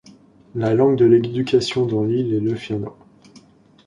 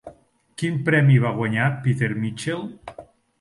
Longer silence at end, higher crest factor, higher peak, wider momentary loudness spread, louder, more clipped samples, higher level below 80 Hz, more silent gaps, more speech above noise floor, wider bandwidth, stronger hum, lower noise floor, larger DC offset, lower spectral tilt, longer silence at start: first, 0.95 s vs 0.35 s; about the same, 16 dB vs 16 dB; about the same, -4 dBFS vs -6 dBFS; second, 13 LU vs 21 LU; about the same, -19 LUFS vs -21 LUFS; neither; about the same, -54 dBFS vs -58 dBFS; neither; about the same, 32 dB vs 30 dB; about the same, 10.5 kHz vs 11.5 kHz; neither; about the same, -50 dBFS vs -51 dBFS; neither; about the same, -7 dB/octave vs -7 dB/octave; first, 0.55 s vs 0.05 s